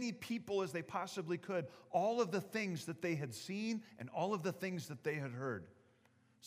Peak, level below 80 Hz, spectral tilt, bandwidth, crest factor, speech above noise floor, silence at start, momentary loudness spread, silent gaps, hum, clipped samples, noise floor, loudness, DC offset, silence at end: -22 dBFS; -86 dBFS; -5.5 dB/octave; 15.5 kHz; 18 dB; 31 dB; 0 s; 6 LU; none; none; under 0.1%; -72 dBFS; -41 LUFS; under 0.1%; 0 s